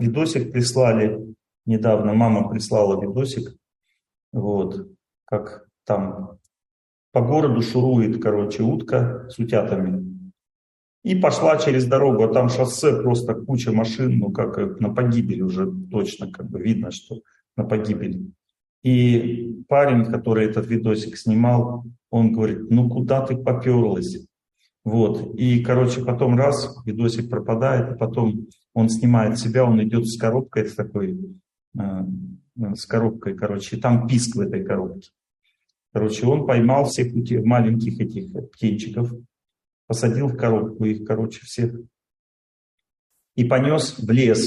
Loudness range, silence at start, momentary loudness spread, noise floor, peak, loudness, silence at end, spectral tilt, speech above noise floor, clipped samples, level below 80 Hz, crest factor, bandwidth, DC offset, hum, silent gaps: 6 LU; 0 s; 13 LU; under -90 dBFS; -4 dBFS; -21 LUFS; 0 s; -7 dB/octave; over 70 dB; under 0.1%; -56 dBFS; 16 dB; 12 kHz; under 0.1%; none; 4.23-4.32 s, 6.71-7.12 s, 10.55-11.02 s, 18.69-18.82 s, 31.67-31.72 s, 39.73-39.88 s, 42.19-42.78 s, 42.99-43.10 s